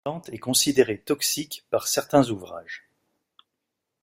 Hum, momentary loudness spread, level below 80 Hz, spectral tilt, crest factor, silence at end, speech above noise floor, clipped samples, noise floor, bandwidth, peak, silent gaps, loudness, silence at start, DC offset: none; 17 LU; -62 dBFS; -3 dB/octave; 22 dB; 1.25 s; 58 dB; under 0.1%; -82 dBFS; 16 kHz; -4 dBFS; none; -24 LUFS; 0.05 s; under 0.1%